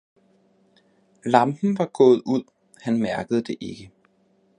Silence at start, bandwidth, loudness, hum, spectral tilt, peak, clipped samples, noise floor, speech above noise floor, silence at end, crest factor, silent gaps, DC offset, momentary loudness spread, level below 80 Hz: 1.25 s; 10 kHz; -22 LUFS; none; -7 dB/octave; 0 dBFS; under 0.1%; -63 dBFS; 42 dB; 0.7 s; 24 dB; none; under 0.1%; 17 LU; -64 dBFS